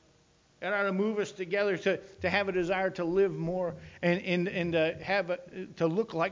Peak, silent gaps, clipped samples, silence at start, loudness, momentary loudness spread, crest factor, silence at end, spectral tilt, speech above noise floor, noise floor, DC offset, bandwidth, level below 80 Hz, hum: -14 dBFS; none; under 0.1%; 0.6 s; -30 LUFS; 6 LU; 18 dB; 0 s; -6.5 dB/octave; 35 dB; -65 dBFS; under 0.1%; 7.6 kHz; -60 dBFS; none